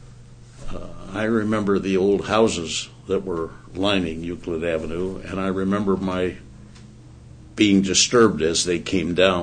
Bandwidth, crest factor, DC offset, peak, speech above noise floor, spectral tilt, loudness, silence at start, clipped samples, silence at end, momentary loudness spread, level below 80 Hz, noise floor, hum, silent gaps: 9.6 kHz; 20 dB; under 0.1%; -2 dBFS; 22 dB; -4 dB/octave; -21 LUFS; 0 s; under 0.1%; 0 s; 14 LU; -44 dBFS; -43 dBFS; none; none